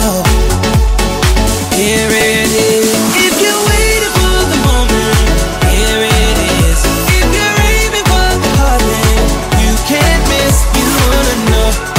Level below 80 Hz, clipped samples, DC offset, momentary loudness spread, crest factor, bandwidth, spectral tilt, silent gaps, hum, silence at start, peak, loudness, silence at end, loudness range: -14 dBFS; under 0.1%; under 0.1%; 2 LU; 10 dB; 16.5 kHz; -4 dB/octave; none; none; 0 s; 0 dBFS; -10 LUFS; 0 s; 1 LU